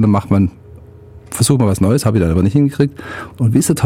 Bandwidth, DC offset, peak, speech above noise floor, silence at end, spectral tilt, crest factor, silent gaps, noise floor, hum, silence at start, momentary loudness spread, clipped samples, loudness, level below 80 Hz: 16.5 kHz; under 0.1%; 0 dBFS; 24 dB; 0 s; -6.5 dB/octave; 14 dB; none; -38 dBFS; none; 0 s; 7 LU; under 0.1%; -14 LUFS; -36 dBFS